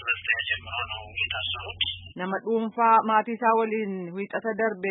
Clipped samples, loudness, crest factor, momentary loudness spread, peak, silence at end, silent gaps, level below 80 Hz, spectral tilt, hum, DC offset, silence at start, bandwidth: under 0.1%; -26 LUFS; 20 dB; 11 LU; -8 dBFS; 0 s; none; -56 dBFS; -8.5 dB/octave; none; under 0.1%; 0 s; 4 kHz